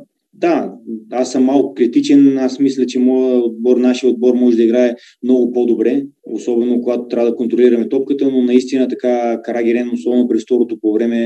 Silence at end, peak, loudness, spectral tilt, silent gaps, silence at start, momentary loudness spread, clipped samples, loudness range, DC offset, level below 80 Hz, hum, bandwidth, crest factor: 0 s; 0 dBFS; -14 LUFS; -6 dB/octave; none; 0 s; 7 LU; under 0.1%; 2 LU; under 0.1%; -74 dBFS; none; 8.6 kHz; 14 dB